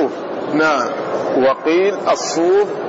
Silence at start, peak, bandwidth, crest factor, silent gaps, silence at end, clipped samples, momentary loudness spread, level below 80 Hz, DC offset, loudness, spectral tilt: 0 s; -6 dBFS; 8 kHz; 10 dB; none; 0 s; under 0.1%; 6 LU; -60 dBFS; under 0.1%; -16 LUFS; -4 dB/octave